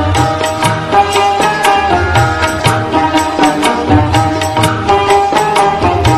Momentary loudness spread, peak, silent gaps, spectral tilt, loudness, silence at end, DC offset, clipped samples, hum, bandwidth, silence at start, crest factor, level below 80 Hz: 3 LU; 0 dBFS; none; -5 dB/octave; -11 LUFS; 0 s; under 0.1%; under 0.1%; none; 14 kHz; 0 s; 10 dB; -26 dBFS